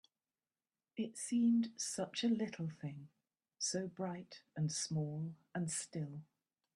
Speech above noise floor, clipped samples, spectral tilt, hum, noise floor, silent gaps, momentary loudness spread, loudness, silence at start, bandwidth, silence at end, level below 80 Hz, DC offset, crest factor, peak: over 51 dB; under 0.1%; -4.5 dB/octave; none; under -90 dBFS; none; 14 LU; -40 LUFS; 0.95 s; 12.5 kHz; 0.55 s; -82 dBFS; under 0.1%; 14 dB; -26 dBFS